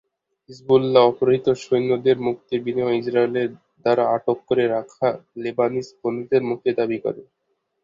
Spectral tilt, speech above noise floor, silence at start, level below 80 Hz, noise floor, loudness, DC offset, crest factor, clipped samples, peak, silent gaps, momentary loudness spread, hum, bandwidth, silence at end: -7 dB/octave; 53 dB; 0.5 s; -62 dBFS; -73 dBFS; -21 LUFS; under 0.1%; 20 dB; under 0.1%; -2 dBFS; none; 11 LU; none; 7.6 kHz; 0.6 s